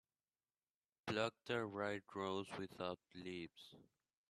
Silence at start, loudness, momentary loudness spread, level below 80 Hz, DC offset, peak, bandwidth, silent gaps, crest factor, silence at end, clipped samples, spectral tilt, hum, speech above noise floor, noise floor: 1.05 s; -46 LUFS; 11 LU; -82 dBFS; under 0.1%; -24 dBFS; 13 kHz; none; 22 dB; 0.45 s; under 0.1%; -5 dB/octave; none; over 44 dB; under -90 dBFS